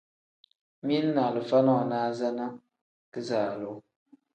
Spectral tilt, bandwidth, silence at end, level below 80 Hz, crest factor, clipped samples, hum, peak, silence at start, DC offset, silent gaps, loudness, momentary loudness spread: -7 dB/octave; 8.8 kHz; 0.55 s; -78 dBFS; 18 dB; under 0.1%; none; -10 dBFS; 0.85 s; under 0.1%; 2.81-3.12 s; -28 LUFS; 15 LU